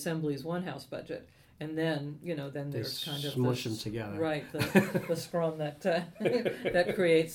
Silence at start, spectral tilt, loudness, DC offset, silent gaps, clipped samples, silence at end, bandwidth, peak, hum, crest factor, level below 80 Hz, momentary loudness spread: 0 s; -5.5 dB/octave; -32 LUFS; under 0.1%; none; under 0.1%; 0 s; 18 kHz; -8 dBFS; none; 24 dB; -64 dBFS; 12 LU